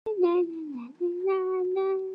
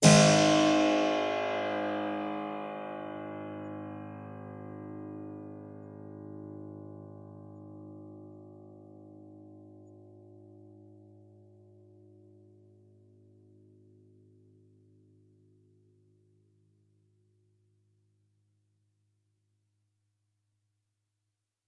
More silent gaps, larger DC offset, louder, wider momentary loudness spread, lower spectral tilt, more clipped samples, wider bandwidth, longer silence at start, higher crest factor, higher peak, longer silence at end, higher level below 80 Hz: neither; neither; about the same, -28 LUFS vs -29 LUFS; second, 9 LU vs 28 LU; first, -7.5 dB/octave vs -4.5 dB/octave; neither; second, 5 kHz vs 11.5 kHz; about the same, 0.05 s vs 0 s; second, 14 dB vs 28 dB; second, -14 dBFS vs -6 dBFS; second, 0 s vs 11.85 s; second, -80 dBFS vs -70 dBFS